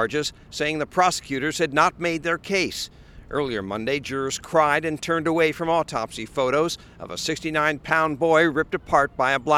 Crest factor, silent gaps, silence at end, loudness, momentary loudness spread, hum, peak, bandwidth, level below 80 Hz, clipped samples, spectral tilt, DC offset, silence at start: 20 dB; none; 0 s; -23 LUFS; 8 LU; none; -2 dBFS; 16 kHz; -50 dBFS; under 0.1%; -4 dB/octave; under 0.1%; 0 s